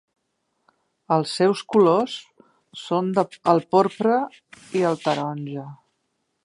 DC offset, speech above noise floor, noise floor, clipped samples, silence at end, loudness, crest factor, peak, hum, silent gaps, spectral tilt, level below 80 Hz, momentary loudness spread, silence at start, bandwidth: under 0.1%; 53 dB; -74 dBFS; under 0.1%; 0.7 s; -22 LUFS; 20 dB; -4 dBFS; none; none; -6 dB/octave; -74 dBFS; 16 LU; 1.1 s; 11.5 kHz